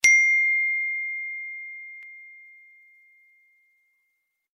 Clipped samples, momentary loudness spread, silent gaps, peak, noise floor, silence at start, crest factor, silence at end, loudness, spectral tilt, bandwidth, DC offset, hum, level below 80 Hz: under 0.1%; 26 LU; none; -2 dBFS; -76 dBFS; 0.05 s; 24 dB; 2.2 s; -21 LUFS; 4 dB/octave; 16 kHz; under 0.1%; none; -74 dBFS